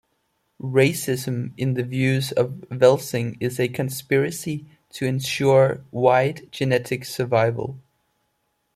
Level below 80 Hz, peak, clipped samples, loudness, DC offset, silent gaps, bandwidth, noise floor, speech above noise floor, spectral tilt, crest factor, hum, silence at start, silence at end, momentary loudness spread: -60 dBFS; -4 dBFS; under 0.1%; -22 LUFS; under 0.1%; none; 16 kHz; -72 dBFS; 51 dB; -5.5 dB/octave; 18 dB; none; 0.65 s; 0.95 s; 11 LU